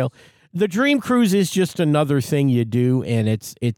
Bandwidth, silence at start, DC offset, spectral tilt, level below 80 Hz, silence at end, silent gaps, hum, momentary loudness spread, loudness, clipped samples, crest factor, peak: 18 kHz; 0 s; under 0.1%; -6.5 dB/octave; -60 dBFS; 0.05 s; none; none; 6 LU; -19 LUFS; under 0.1%; 14 dB; -6 dBFS